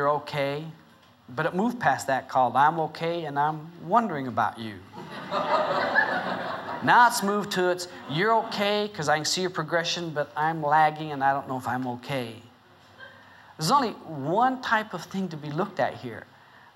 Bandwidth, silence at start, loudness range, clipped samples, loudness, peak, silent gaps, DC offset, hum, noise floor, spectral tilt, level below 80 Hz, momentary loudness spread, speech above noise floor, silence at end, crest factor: 16 kHz; 0 s; 4 LU; under 0.1%; -26 LUFS; -6 dBFS; none; under 0.1%; none; -54 dBFS; -4 dB/octave; -72 dBFS; 11 LU; 29 dB; 0.55 s; 20 dB